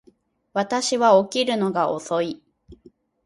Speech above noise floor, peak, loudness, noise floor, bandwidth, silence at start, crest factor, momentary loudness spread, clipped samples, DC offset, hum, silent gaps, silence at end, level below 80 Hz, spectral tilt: 38 dB; -4 dBFS; -21 LUFS; -59 dBFS; 11.5 kHz; 0.55 s; 18 dB; 12 LU; under 0.1%; under 0.1%; none; none; 0.5 s; -62 dBFS; -4 dB/octave